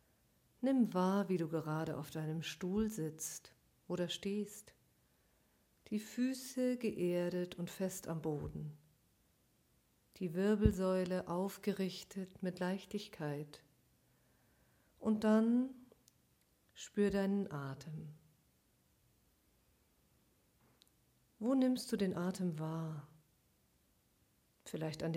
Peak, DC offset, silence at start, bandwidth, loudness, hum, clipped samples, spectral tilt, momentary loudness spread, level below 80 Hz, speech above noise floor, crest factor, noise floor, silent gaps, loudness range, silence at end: -16 dBFS; under 0.1%; 0.6 s; 16.5 kHz; -39 LUFS; none; under 0.1%; -6 dB/octave; 13 LU; -60 dBFS; 38 dB; 24 dB; -75 dBFS; none; 7 LU; 0 s